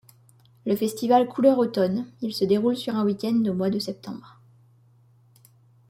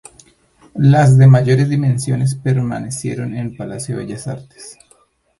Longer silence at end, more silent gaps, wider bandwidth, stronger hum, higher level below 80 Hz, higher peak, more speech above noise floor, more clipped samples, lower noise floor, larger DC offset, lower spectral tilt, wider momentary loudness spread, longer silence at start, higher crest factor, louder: first, 1.75 s vs 0.7 s; neither; first, 16.5 kHz vs 11.5 kHz; neither; second, -68 dBFS vs -48 dBFS; second, -6 dBFS vs 0 dBFS; second, 34 dB vs 41 dB; neither; about the same, -58 dBFS vs -55 dBFS; neither; about the same, -6.5 dB/octave vs -7 dB/octave; second, 13 LU vs 21 LU; about the same, 0.65 s vs 0.75 s; about the same, 18 dB vs 16 dB; second, -24 LUFS vs -15 LUFS